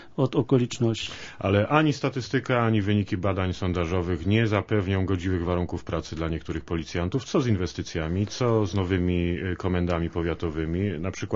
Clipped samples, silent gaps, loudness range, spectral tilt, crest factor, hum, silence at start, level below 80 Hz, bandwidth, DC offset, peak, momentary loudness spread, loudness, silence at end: under 0.1%; none; 3 LU; -6.5 dB/octave; 22 dB; none; 0 s; -44 dBFS; 7.8 kHz; under 0.1%; -4 dBFS; 8 LU; -26 LUFS; 0 s